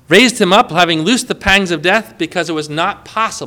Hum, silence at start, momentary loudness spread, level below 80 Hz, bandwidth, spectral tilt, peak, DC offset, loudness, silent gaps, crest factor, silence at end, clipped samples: none; 0.1 s; 9 LU; -38 dBFS; over 20 kHz; -3.5 dB/octave; 0 dBFS; under 0.1%; -13 LUFS; none; 14 dB; 0 s; 0.3%